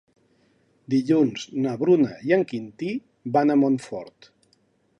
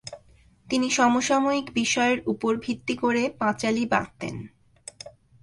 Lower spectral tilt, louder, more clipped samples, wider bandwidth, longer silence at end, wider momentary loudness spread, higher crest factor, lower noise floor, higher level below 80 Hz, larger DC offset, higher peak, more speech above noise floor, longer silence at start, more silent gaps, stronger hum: first, -7 dB/octave vs -3.5 dB/octave; about the same, -23 LUFS vs -24 LUFS; neither; second, 10 kHz vs 11.5 kHz; first, 0.9 s vs 0.35 s; second, 11 LU vs 21 LU; about the same, 18 dB vs 18 dB; first, -65 dBFS vs -56 dBFS; second, -70 dBFS vs -60 dBFS; neither; about the same, -6 dBFS vs -8 dBFS; first, 43 dB vs 32 dB; first, 0.9 s vs 0.05 s; neither; neither